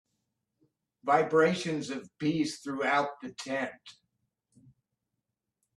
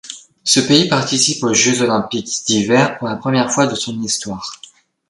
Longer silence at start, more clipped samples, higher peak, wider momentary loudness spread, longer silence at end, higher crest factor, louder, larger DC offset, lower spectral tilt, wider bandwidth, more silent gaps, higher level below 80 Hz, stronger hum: first, 1.05 s vs 0.05 s; neither; second, -10 dBFS vs 0 dBFS; first, 13 LU vs 10 LU; first, 1.85 s vs 0.55 s; first, 22 dB vs 16 dB; second, -30 LUFS vs -15 LUFS; neither; first, -5 dB/octave vs -3 dB/octave; about the same, 12 kHz vs 11.5 kHz; neither; second, -74 dBFS vs -54 dBFS; neither